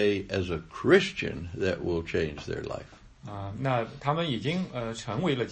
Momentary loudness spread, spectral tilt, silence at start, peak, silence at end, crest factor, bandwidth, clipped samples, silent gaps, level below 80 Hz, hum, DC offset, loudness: 15 LU; -6 dB/octave; 0 s; -8 dBFS; 0 s; 22 dB; 8.8 kHz; under 0.1%; none; -52 dBFS; none; under 0.1%; -29 LUFS